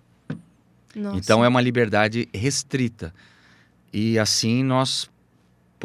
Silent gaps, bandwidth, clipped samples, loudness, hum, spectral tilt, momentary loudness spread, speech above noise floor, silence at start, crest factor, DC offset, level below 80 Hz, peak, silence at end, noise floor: none; 15.5 kHz; under 0.1%; -21 LUFS; 60 Hz at -50 dBFS; -4.5 dB/octave; 19 LU; 38 dB; 0.3 s; 22 dB; under 0.1%; -56 dBFS; -2 dBFS; 0 s; -60 dBFS